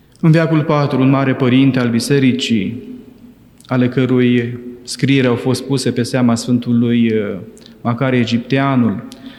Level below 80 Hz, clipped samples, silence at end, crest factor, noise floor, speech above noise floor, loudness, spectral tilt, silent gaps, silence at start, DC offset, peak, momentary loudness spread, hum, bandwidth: -54 dBFS; under 0.1%; 0 s; 14 dB; -42 dBFS; 28 dB; -15 LUFS; -6.5 dB/octave; none; 0.25 s; under 0.1%; -2 dBFS; 11 LU; none; 12.5 kHz